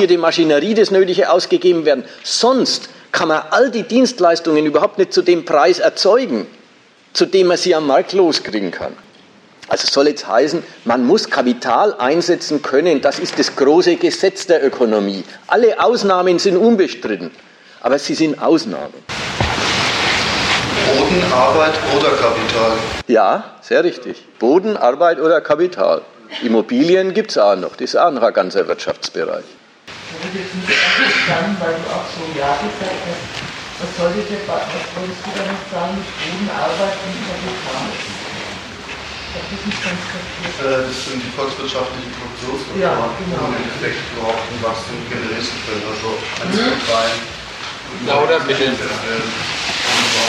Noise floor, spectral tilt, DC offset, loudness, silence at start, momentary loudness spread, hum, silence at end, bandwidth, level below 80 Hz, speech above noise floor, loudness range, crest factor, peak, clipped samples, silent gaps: -48 dBFS; -4 dB/octave; under 0.1%; -16 LUFS; 0 s; 12 LU; none; 0 s; 12.5 kHz; -46 dBFS; 32 dB; 8 LU; 14 dB; -2 dBFS; under 0.1%; none